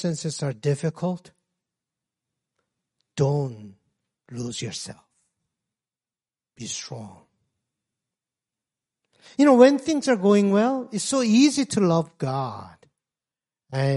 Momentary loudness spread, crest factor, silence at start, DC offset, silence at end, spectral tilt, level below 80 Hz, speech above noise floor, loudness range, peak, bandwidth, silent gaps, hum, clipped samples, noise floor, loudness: 19 LU; 22 dB; 0 s; under 0.1%; 0 s; -5.5 dB/octave; -66 dBFS; over 68 dB; 20 LU; -2 dBFS; 11.5 kHz; none; none; under 0.1%; under -90 dBFS; -22 LUFS